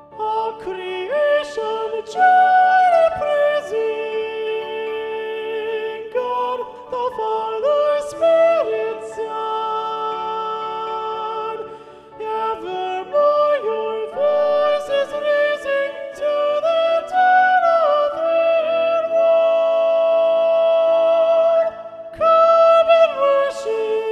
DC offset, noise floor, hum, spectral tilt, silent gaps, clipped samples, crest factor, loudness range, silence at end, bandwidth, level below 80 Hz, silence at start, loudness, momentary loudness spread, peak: under 0.1%; -39 dBFS; none; -3.5 dB/octave; none; under 0.1%; 14 dB; 9 LU; 0 s; 10 kHz; -62 dBFS; 0.1 s; -18 LUFS; 12 LU; -4 dBFS